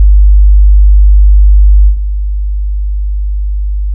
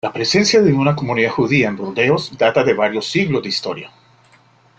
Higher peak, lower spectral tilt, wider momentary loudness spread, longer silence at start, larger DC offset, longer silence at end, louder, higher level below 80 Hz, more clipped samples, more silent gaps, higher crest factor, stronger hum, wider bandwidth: about the same, 0 dBFS vs -2 dBFS; first, -22.5 dB/octave vs -5 dB/octave; first, 10 LU vs 7 LU; about the same, 0 s vs 0.05 s; neither; second, 0 s vs 0.9 s; first, -10 LUFS vs -16 LUFS; first, -6 dBFS vs -54 dBFS; first, 0.2% vs under 0.1%; neither; second, 6 dB vs 16 dB; neither; second, 0.1 kHz vs 9 kHz